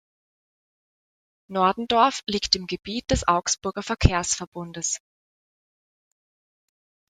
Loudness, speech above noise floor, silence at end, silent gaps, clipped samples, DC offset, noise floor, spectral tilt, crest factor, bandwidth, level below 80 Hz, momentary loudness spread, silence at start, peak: -24 LUFS; over 66 dB; 2.15 s; 4.47-4.52 s; under 0.1%; under 0.1%; under -90 dBFS; -3.5 dB/octave; 24 dB; 12 kHz; -38 dBFS; 10 LU; 1.5 s; -2 dBFS